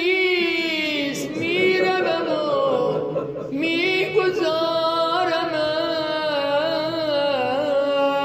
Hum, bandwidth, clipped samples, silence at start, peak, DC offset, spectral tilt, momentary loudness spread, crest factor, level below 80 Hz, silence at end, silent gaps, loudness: none; 15.5 kHz; under 0.1%; 0 s; -6 dBFS; under 0.1%; -4.5 dB/octave; 5 LU; 14 dB; -62 dBFS; 0 s; none; -21 LUFS